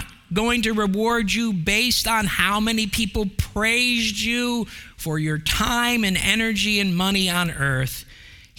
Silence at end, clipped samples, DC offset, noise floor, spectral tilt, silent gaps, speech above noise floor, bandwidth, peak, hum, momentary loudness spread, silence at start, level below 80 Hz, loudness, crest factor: 0.2 s; under 0.1%; under 0.1%; -45 dBFS; -3.5 dB/octave; none; 24 dB; 18 kHz; -2 dBFS; none; 8 LU; 0 s; -38 dBFS; -21 LUFS; 20 dB